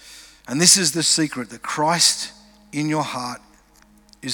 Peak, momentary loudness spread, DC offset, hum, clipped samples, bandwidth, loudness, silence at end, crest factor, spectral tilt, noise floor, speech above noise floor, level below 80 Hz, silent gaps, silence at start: 0 dBFS; 19 LU; under 0.1%; none; under 0.1%; over 20 kHz; -18 LUFS; 0 s; 22 dB; -2 dB/octave; -53 dBFS; 33 dB; -60 dBFS; none; 0.05 s